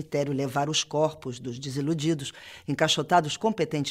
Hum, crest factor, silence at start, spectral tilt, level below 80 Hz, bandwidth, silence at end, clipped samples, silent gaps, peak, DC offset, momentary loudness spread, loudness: none; 20 dB; 0 s; -4.5 dB/octave; -64 dBFS; 15.5 kHz; 0 s; under 0.1%; none; -8 dBFS; under 0.1%; 12 LU; -27 LUFS